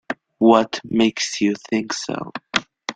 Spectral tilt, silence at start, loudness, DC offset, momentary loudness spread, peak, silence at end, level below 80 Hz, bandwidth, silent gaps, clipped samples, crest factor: -4 dB/octave; 0.1 s; -20 LUFS; under 0.1%; 11 LU; 0 dBFS; 0.05 s; -60 dBFS; 9.4 kHz; none; under 0.1%; 20 dB